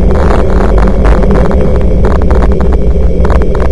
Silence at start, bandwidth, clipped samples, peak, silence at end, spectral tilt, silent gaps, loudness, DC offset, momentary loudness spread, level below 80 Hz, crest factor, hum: 0 s; 9.8 kHz; 4%; 0 dBFS; 0 s; -8.5 dB/octave; none; -10 LUFS; under 0.1%; 2 LU; -8 dBFS; 6 dB; none